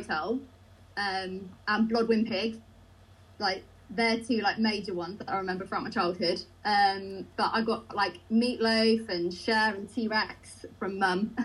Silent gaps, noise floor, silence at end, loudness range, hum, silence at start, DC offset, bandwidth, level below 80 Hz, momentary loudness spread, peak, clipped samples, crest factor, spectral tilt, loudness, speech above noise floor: none; -55 dBFS; 0 s; 3 LU; none; 0 s; under 0.1%; 12 kHz; -62 dBFS; 11 LU; -12 dBFS; under 0.1%; 18 dB; -5 dB/octave; -29 LUFS; 26 dB